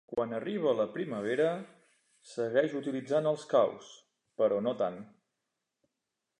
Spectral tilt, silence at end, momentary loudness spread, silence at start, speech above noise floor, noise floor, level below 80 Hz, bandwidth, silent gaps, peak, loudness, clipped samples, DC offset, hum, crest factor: -6 dB/octave; 1.35 s; 14 LU; 0.1 s; 56 dB; -87 dBFS; -78 dBFS; 10.5 kHz; none; -14 dBFS; -31 LUFS; under 0.1%; under 0.1%; none; 20 dB